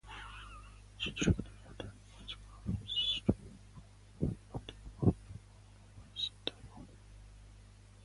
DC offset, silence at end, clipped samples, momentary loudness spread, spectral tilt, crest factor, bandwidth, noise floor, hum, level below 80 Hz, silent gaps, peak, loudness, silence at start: under 0.1%; 0 s; under 0.1%; 24 LU; -5 dB/octave; 24 dB; 11.5 kHz; -57 dBFS; 50 Hz at -55 dBFS; -50 dBFS; none; -16 dBFS; -38 LUFS; 0.05 s